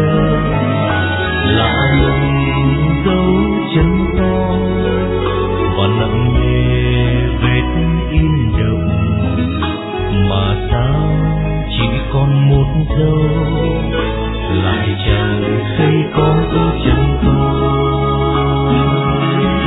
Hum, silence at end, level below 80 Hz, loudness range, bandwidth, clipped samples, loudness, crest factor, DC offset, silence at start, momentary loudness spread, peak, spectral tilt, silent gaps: none; 0 s; -22 dBFS; 2 LU; 4 kHz; under 0.1%; -14 LUFS; 12 dB; under 0.1%; 0 s; 3 LU; 0 dBFS; -11 dB/octave; none